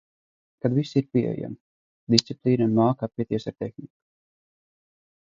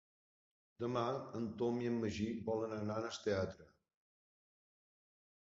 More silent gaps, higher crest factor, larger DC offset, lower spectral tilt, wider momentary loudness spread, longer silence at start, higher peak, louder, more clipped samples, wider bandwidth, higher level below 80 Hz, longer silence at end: first, 1.61-2.07 s vs none; first, 26 dB vs 18 dB; neither; about the same, -6 dB/octave vs -6 dB/octave; first, 14 LU vs 6 LU; second, 0.65 s vs 0.8 s; first, 0 dBFS vs -24 dBFS; first, -24 LUFS vs -40 LUFS; neither; about the same, 7.8 kHz vs 7.6 kHz; about the same, -64 dBFS vs -66 dBFS; second, 1.4 s vs 1.75 s